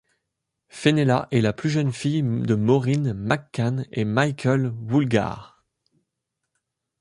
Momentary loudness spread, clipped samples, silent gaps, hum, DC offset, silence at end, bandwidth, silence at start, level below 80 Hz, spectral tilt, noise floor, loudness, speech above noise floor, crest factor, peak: 5 LU; under 0.1%; none; none; under 0.1%; 1.55 s; 11 kHz; 0.75 s; -56 dBFS; -7 dB/octave; -81 dBFS; -23 LUFS; 59 dB; 20 dB; -4 dBFS